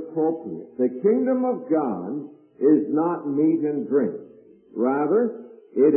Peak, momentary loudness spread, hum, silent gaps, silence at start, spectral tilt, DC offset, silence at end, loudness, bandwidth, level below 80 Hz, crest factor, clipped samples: -8 dBFS; 14 LU; none; none; 0 s; -14 dB/octave; under 0.1%; 0 s; -23 LUFS; 2.7 kHz; -78 dBFS; 16 dB; under 0.1%